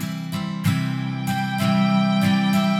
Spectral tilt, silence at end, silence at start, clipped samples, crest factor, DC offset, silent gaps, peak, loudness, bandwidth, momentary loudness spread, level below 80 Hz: -6 dB/octave; 0 s; 0 s; under 0.1%; 14 dB; under 0.1%; none; -8 dBFS; -21 LUFS; 16 kHz; 8 LU; -62 dBFS